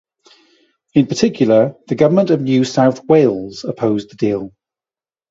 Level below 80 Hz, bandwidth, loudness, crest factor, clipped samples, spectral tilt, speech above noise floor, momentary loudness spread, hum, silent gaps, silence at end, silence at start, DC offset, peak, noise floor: -56 dBFS; 7.8 kHz; -15 LUFS; 16 dB; under 0.1%; -6.5 dB/octave; over 76 dB; 8 LU; none; none; 0.85 s; 0.95 s; under 0.1%; 0 dBFS; under -90 dBFS